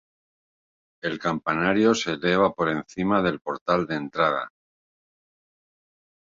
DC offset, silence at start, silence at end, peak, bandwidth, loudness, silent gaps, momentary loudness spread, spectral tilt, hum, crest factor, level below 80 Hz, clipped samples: under 0.1%; 1.05 s; 1.85 s; -6 dBFS; 7.8 kHz; -24 LUFS; 3.61-3.66 s; 10 LU; -5.5 dB/octave; none; 20 dB; -58 dBFS; under 0.1%